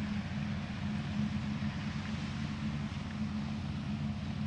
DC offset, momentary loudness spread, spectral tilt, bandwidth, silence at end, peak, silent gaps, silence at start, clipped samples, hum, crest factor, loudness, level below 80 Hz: under 0.1%; 3 LU; -6.5 dB/octave; 9.4 kHz; 0 s; -22 dBFS; none; 0 s; under 0.1%; none; 14 dB; -38 LUFS; -52 dBFS